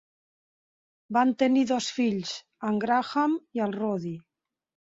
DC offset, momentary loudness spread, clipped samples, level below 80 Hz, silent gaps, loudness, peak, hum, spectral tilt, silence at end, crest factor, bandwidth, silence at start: under 0.1%; 11 LU; under 0.1%; -72 dBFS; none; -27 LUFS; -10 dBFS; none; -5 dB/octave; 0.65 s; 18 dB; 7.8 kHz; 1.1 s